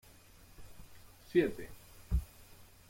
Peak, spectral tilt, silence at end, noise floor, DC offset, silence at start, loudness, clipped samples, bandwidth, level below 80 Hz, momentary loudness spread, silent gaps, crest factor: -16 dBFS; -7 dB/octave; 0.25 s; -59 dBFS; under 0.1%; 0.6 s; -35 LUFS; under 0.1%; 16.5 kHz; -46 dBFS; 26 LU; none; 22 dB